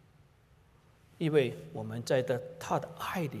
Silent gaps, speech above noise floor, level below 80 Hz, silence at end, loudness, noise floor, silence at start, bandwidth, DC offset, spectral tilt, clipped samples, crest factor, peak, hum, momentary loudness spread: none; 31 dB; -68 dBFS; 0 s; -33 LUFS; -63 dBFS; 1.2 s; 15.5 kHz; under 0.1%; -6 dB/octave; under 0.1%; 20 dB; -14 dBFS; none; 10 LU